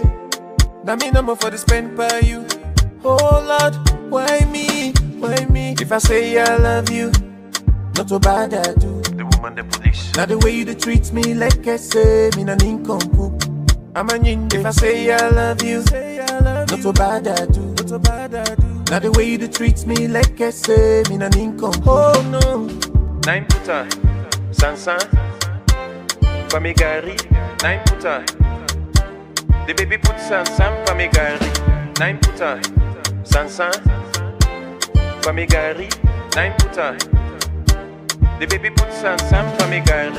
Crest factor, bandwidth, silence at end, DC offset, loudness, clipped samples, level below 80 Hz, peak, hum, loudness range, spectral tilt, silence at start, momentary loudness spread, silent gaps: 16 dB; 16 kHz; 0 s; under 0.1%; -17 LUFS; under 0.1%; -20 dBFS; 0 dBFS; none; 2 LU; -4.5 dB/octave; 0 s; 6 LU; none